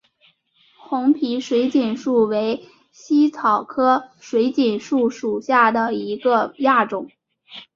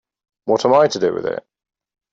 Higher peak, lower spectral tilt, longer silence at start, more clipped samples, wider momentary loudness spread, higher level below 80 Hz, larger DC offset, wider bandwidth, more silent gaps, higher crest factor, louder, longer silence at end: about the same, -2 dBFS vs -4 dBFS; about the same, -5.5 dB/octave vs -5 dB/octave; first, 0.9 s vs 0.45 s; neither; second, 8 LU vs 15 LU; about the same, -66 dBFS vs -62 dBFS; neither; about the same, 7.4 kHz vs 8 kHz; neither; about the same, 18 dB vs 16 dB; about the same, -19 LUFS vs -17 LUFS; second, 0.1 s vs 0.7 s